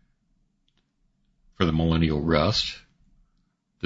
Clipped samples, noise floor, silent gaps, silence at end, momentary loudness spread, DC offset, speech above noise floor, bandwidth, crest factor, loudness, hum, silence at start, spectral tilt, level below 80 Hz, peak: under 0.1%; -70 dBFS; none; 1.05 s; 8 LU; under 0.1%; 48 dB; 8 kHz; 20 dB; -24 LUFS; none; 1.6 s; -6 dB/octave; -42 dBFS; -6 dBFS